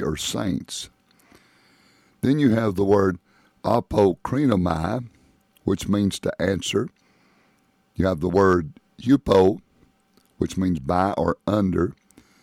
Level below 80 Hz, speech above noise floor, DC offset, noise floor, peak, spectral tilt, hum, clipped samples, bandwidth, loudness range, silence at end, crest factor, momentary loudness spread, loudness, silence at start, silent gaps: -46 dBFS; 42 dB; under 0.1%; -63 dBFS; -6 dBFS; -6 dB/octave; none; under 0.1%; 15.5 kHz; 3 LU; 0.5 s; 16 dB; 13 LU; -22 LUFS; 0 s; none